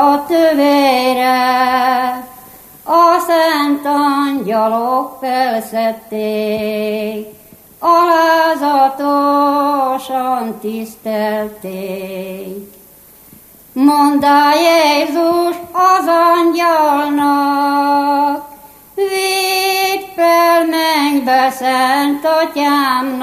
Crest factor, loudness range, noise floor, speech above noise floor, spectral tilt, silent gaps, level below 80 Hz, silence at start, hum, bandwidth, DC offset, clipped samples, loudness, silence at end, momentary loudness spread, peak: 14 dB; 6 LU; -42 dBFS; 29 dB; -3.5 dB/octave; none; -58 dBFS; 0 s; none; 15 kHz; under 0.1%; under 0.1%; -13 LUFS; 0 s; 13 LU; 0 dBFS